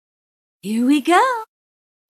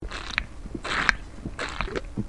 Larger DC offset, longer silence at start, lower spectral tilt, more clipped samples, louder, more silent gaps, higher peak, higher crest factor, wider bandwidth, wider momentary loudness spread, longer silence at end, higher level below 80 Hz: second, under 0.1% vs 0.5%; first, 0.65 s vs 0 s; about the same, -4 dB/octave vs -3.5 dB/octave; neither; first, -17 LUFS vs -29 LUFS; neither; second, -4 dBFS vs 0 dBFS; second, 16 dB vs 30 dB; first, 14 kHz vs 11.5 kHz; about the same, 13 LU vs 14 LU; first, 0.65 s vs 0 s; second, -80 dBFS vs -38 dBFS